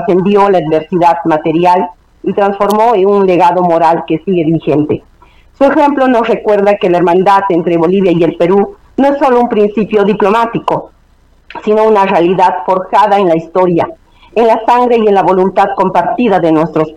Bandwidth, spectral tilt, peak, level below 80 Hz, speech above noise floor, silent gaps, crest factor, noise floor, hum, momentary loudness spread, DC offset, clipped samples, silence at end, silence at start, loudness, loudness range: 15 kHz; -7.5 dB/octave; 0 dBFS; -44 dBFS; 37 dB; none; 10 dB; -46 dBFS; none; 5 LU; under 0.1%; under 0.1%; 0 s; 0 s; -10 LUFS; 2 LU